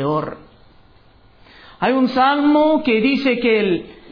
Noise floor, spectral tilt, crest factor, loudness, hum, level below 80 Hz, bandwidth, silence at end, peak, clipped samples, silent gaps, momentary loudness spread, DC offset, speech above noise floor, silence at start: -49 dBFS; -7.5 dB/octave; 14 dB; -17 LUFS; none; -52 dBFS; 5.4 kHz; 0.2 s; -6 dBFS; under 0.1%; none; 9 LU; under 0.1%; 33 dB; 0 s